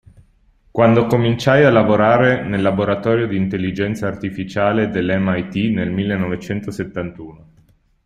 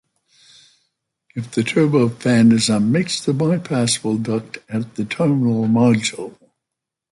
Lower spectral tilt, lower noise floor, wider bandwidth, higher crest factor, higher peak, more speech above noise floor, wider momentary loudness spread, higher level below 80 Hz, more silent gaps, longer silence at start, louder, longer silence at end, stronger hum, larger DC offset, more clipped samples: first, -7.5 dB/octave vs -5.5 dB/octave; second, -55 dBFS vs -83 dBFS; first, 13.5 kHz vs 11.5 kHz; about the same, 16 dB vs 14 dB; about the same, -2 dBFS vs -4 dBFS; second, 38 dB vs 66 dB; about the same, 13 LU vs 12 LU; first, -48 dBFS vs -58 dBFS; neither; second, 0.75 s vs 1.35 s; about the same, -17 LUFS vs -18 LUFS; about the same, 0.7 s vs 0.8 s; neither; neither; neither